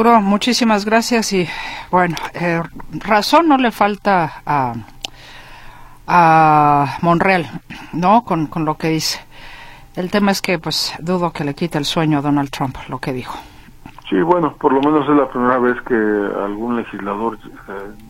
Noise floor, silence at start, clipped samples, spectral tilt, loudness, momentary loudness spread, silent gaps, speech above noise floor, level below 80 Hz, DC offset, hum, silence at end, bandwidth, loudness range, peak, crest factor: -38 dBFS; 0 s; under 0.1%; -5 dB/octave; -16 LUFS; 16 LU; none; 22 dB; -42 dBFS; under 0.1%; none; 0 s; 16.5 kHz; 5 LU; 0 dBFS; 16 dB